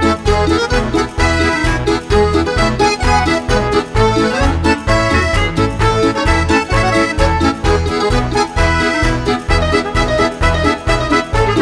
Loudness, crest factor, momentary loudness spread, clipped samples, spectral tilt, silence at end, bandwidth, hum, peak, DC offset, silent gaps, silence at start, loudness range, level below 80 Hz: -14 LUFS; 12 dB; 2 LU; under 0.1%; -5.5 dB/octave; 0 s; 11 kHz; none; 0 dBFS; under 0.1%; none; 0 s; 1 LU; -20 dBFS